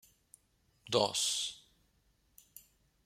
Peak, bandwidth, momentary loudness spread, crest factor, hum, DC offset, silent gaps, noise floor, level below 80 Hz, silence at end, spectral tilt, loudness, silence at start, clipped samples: -12 dBFS; 16 kHz; 25 LU; 26 dB; none; under 0.1%; none; -73 dBFS; -74 dBFS; 0.45 s; -2 dB/octave; -33 LUFS; 0.85 s; under 0.1%